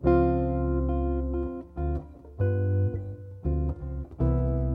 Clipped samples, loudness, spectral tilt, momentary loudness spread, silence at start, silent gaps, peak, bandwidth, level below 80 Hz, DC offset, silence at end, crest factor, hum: under 0.1%; -29 LUFS; -12.5 dB/octave; 11 LU; 0 s; none; -10 dBFS; 3.6 kHz; -32 dBFS; under 0.1%; 0 s; 18 dB; none